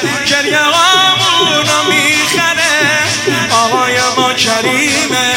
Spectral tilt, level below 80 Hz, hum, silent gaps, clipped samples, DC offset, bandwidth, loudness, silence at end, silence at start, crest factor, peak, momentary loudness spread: -1.5 dB/octave; -52 dBFS; none; none; under 0.1%; under 0.1%; 17 kHz; -9 LUFS; 0 s; 0 s; 12 dB; 0 dBFS; 4 LU